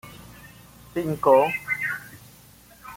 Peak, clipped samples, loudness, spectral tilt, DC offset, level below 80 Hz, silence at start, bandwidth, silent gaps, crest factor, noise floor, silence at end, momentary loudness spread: -4 dBFS; under 0.1%; -23 LUFS; -6 dB/octave; under 0.1%; -58 dBFS; 0.05 s; 17 kHz; none; 22 dB; -51 dBFS; 0 s; 26 LU